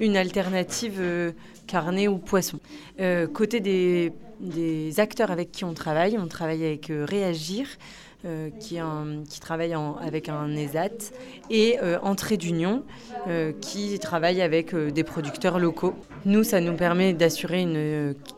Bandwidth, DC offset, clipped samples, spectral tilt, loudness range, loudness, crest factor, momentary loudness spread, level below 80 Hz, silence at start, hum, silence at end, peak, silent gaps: 16 kHz; under 0.1%; under 0.1%; -5.5 dB/octave; 7 LU; -26 LUFS; 18 dB; 12 LU; -56 dBFS; 0 s; none; 0 s; -8 dBFS; none